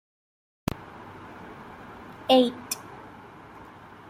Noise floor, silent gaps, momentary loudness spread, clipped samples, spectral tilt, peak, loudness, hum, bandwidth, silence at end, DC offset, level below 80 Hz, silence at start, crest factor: -47 dBFS; none; 25 LU; under 0.1%; -4 dB/octave; -6 dBFS; -26 LUFS; none; 16 kHz; 1.05 s; under 0.1%; -56 dBFS; 0.8 s; 24 dB